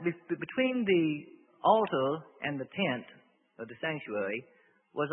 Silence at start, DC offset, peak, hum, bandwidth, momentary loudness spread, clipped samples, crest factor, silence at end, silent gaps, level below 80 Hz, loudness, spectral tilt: 0 s; under 0.1%; -10 dBFS; none; 4 kHz; 13 LU; under 0.1%; 22 dB; 0 s; none; -76 dBFS; -31 LUFS; -9.5 dB/octave